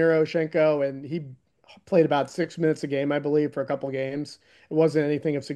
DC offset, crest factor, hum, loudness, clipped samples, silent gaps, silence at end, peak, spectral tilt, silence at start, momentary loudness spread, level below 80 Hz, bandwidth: under 0.1%; 18 dB; none; -25 LUFS; under 0.1%; none; 0 s; -8 dBFS; -7 dB/octave; 0 s; 12 LU; -70 dBFS; 10 kHz